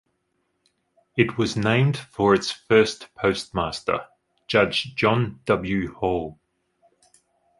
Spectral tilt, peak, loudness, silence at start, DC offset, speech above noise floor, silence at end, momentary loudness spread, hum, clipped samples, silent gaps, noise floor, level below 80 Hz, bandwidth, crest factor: -5.5 dB/octave; -2 dBFS; -23 LUFS; 1.15 s; under 0.1%; 51 dB; 1.25 s; 8 LU; none; under 0.1%; none; -73 dBFS; -50 dBFS; 11.5 kHz; 22 dB